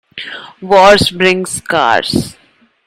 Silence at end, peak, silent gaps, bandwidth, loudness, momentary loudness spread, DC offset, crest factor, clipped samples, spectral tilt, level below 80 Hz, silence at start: 0.55 s; 0 dBFS; none; 16 kHz; -10 LUFS; 20 LU; under 0.1%; 12 dB; 0.7%; -3.5 dB/octave; -40 dBFS; 0.15 s